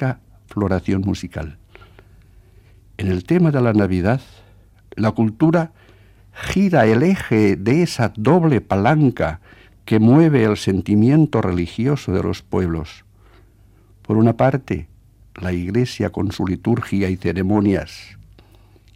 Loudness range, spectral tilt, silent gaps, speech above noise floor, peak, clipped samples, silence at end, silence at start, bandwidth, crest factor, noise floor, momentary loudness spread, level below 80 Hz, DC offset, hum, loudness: 6 LU; -8 dB/octave; none; 33 dB; -2 dBFS; under 0.1%; 0.9 s; 0 s; 14 kHz; 16 dB; -50 dBFS; 13 LU; -44 dBFS; under 0.1%; none; -18 LUFS